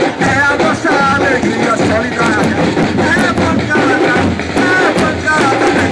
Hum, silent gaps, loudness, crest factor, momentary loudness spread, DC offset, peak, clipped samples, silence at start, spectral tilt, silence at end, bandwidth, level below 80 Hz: none; none; -12 LUFS; 12 dB; 3 LU; under 0.1%; 0 dBFS; under 0.1%; 0 s; -5 dB/octave; 0 s; 11 kHz; -38 dBFS